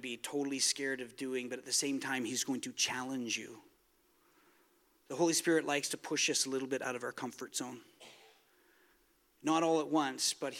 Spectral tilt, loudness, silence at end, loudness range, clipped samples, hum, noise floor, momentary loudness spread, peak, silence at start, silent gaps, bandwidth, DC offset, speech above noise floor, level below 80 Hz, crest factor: -2 dB/octave; -34 LUFS; 0 s; 4 LU; under 0.1%; none; -72 dBFS; 10 LU; -16 dBFS; 0 s; none; 17 kHz; under 0.1%; 36 dB; -86 dBFS; 20 dB